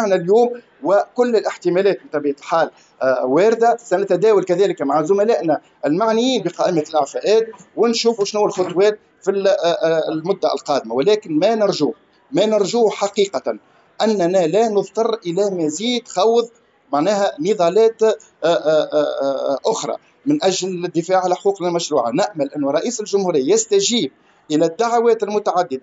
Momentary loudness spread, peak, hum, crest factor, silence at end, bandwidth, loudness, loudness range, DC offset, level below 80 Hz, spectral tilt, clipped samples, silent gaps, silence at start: 6 LU; -4 dBFS; none; 12 dB; 0.05 s; 8 kHz; -18 LUFS; 2 LU; under 0.1%; -76 dBFS; -4.5 dB/octave; under 0.1%; none; 0 s